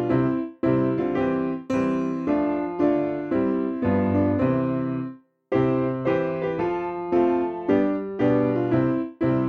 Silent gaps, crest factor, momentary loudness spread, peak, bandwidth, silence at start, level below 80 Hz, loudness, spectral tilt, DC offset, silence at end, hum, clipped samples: none; 14 dB; 4 LU; -8 dBFS; 6.6 kHz; 0 s; -52 dBFS; -24 LUFS; -9.5 dB/octave; under 0.1%; 0 s; none; under 0.1%